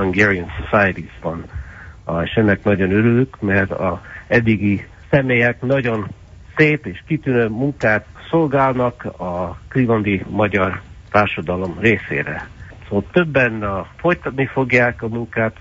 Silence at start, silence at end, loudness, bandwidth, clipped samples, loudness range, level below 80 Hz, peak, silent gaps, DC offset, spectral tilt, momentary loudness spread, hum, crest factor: 0 s; 0.1 s; -18 LUFS; 7.8 kHz; under 0.1%; 2 LU; -40 dBFS; 0 dBFS; none; under 0.1%; -8 dB/octave; 12 LU; none; 18 dB